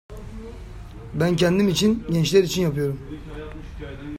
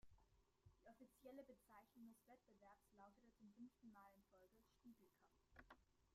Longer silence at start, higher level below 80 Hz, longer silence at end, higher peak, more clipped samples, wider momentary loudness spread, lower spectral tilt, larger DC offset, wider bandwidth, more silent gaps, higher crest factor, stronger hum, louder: about the same, 0.1 s vs 0 s; first, -40 dBFS vs -84 dBFS; about the same, 0 s vs 0 s; first, -4 dBFS vs -50 dBFS; neither; first, 20 LU vs 5 LU; about the same, -5.5 dB/octave vs -5.5 dB/octave; neither; first, 16 kHz vs 14 kHz; neither; about the same, 18 dB vs 20 dB; neither; first, -21 LUFS vs -67 LUFS